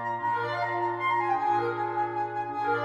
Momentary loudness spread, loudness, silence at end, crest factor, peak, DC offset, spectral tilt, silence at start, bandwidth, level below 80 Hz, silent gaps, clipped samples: 4 LU; -28 LUFS; 0 s; 12 dB; -16 dBFS; under 0.1%; -6.5 dB/octave; 0 s; 8.8 kHz; -70 dBFS; none; under 0.1%